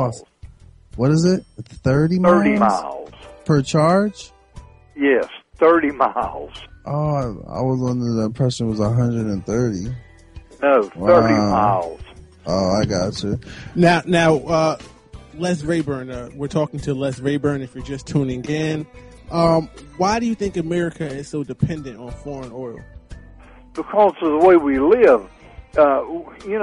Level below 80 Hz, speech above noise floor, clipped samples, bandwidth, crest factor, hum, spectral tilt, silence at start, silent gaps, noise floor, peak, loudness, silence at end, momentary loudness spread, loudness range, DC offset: -44 dBFS; 25 dB; under 0.1%; 11 kHz; 16 dB; none; -6.5 dB/octave; 0 s; none; -43 dBFS; -2 dBFS; -19 LUFS; 0 s; 17 LU; 6 LU; under 0.1%